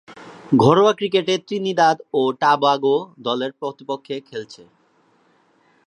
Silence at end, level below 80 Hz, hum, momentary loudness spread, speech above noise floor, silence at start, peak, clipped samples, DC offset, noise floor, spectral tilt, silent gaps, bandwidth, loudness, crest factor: 1.3 s; -66 dBFS; none; 15 LU; 41 dB; 0.1 s; -2 dBFS; under 0.1%; under 0.1%; -60 dBFS; -5.5 dB/octave; none; 10 kHz; -19 LUFS; 18 dB